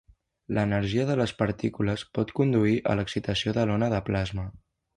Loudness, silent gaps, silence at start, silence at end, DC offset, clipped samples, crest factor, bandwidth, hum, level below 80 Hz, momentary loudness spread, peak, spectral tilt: -27 LUFS; none; 0.5 s; 0.4 s; under 0.1%; under 0.1%; 18 dB; 11 kHz; none; -48 dBFS; 6 LU; -10 dBFS; -7 dB/octave